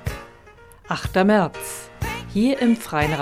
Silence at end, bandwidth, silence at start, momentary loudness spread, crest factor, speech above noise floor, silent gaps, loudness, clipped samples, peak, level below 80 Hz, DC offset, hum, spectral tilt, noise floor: 0 s; 16 kHz; 0 s; 14 LU; 16 dB; 27 dB; none; -22 LUFS; under 0.1%; -6 dBFS; -40 dBFS; under 0.1%; none; -5.5 dB/octave; -47 dBFS